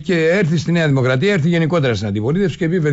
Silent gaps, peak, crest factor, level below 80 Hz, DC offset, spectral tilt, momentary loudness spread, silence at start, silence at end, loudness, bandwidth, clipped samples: none; -6 dBFS; 10 dB; -46 dBFS; under 0.1%; -7 dB/octave; 3 LU; 0 s; 0 s; -16 LUFS; 8 kHz; under 0.1%